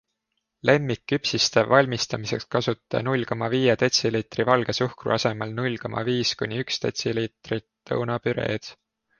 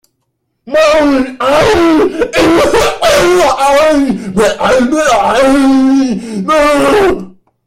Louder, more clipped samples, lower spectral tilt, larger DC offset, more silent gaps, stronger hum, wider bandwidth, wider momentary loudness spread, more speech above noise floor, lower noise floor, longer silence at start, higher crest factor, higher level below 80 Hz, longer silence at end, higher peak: second, -24 LUFS vs -9 LUFS; neither; about the same, -4.5 dB/octave vs -4 dB/octave; neither; neither; neither; second, 10 kHz vs 16 kHz; first, 9 LU vs 4 LU; about the same, 55 dB vs 57 dB; first, -79 dBFS vs -65 dBFS; about the same, 0.65 s vs 0.65 s; first, 22 dB vs 10 dB; second, -58 dBFS vs -34 dBFS; about the same, 0.45 s vs 0.35 s; about the same, -2 dBFS vs 0 dBFS